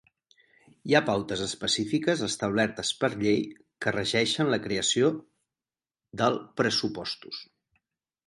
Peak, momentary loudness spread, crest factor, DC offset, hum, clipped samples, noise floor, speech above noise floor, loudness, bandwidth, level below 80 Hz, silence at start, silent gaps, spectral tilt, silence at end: -8 dBFS; 12 LU; 22 dB; under 0.1%; none; under 0.1%; under -90 dBFS; over 63 dB; -27 LUFS; 11.5 kHz; -62 dBFS; 0.85 s; none; -3.5 dB/octave; 0.85 s